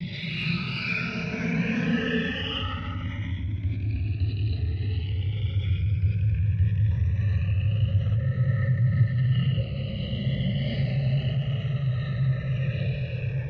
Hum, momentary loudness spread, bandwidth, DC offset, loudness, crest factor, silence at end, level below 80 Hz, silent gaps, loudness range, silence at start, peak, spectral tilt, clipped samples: none; 6 LU; 6.2 kHz; under 0.1%; -27 LUFS; 14 dB; 0 s; -38 dBFS; none; 4 LU; 0 s; -12 dBFS; -8 dB/octave; under 0.1%